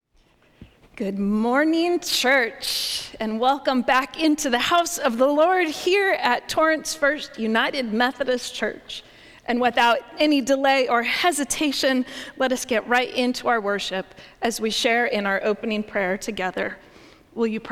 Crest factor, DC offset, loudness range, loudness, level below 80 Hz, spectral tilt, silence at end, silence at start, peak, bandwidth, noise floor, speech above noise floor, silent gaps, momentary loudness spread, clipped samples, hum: 18 dB; under 0.1%; 3 LU; -22 LUFS; -56 dBFS; -3 dB/octave; 0 s; 0.6 s; -4 dBFS; 17 kHz; -60 dBFS; 38 dB; none; 9 LU; under 0.1%; none